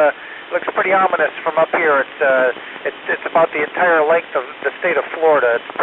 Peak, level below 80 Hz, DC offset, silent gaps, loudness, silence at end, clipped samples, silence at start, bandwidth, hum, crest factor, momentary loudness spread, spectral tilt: -2 dBFS; -68 dBFS; under 0.1%; none; -17 LUFS; 0 s; under 0.1%; 0 s; 4.1 kHz; none; 14 dB; 10 LU; -6.5 dB/octave